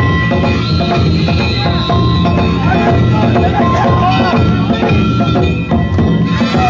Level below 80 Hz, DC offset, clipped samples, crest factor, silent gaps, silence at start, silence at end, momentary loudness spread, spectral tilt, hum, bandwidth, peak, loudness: -22 dBFS; under 0.1%; under 0.1%; 8 dB; none; 0 s; 0 s; 2 LU; -7.5 dB/octave; none; 7.4 kHz; -2 dBFS; -12 LUFS